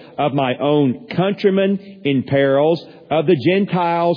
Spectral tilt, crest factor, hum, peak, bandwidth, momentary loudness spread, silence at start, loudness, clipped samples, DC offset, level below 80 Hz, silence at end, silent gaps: -9.5 dB/octave; 14 dB; none; -4 dBFS; 5.4 kHz; 5 LU; 0 s; -17 LUFS; under 0.1%; under 0.1%; -60 dBFS; 0 s; none